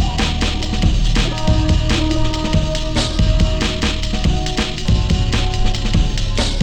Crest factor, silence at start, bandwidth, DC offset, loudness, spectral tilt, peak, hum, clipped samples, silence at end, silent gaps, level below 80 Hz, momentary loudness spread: 12 dB; 0 s; 9.8 kHz; under 0.1%; -18 LUFS; -5 dB/octave; -2 dBFS; none; under 0.1%; 0 s; none; -18 dBFS; 3 LU